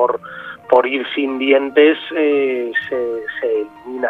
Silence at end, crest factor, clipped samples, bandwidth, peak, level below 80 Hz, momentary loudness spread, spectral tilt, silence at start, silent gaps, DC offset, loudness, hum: 0 s; 16 dB; under 0.1%; 4.4 kHz; 0 dBFS; -64 dBFS; 11 LU; -6 dB/octave; 0 s; none; under 0.1%; -17 LUFS; none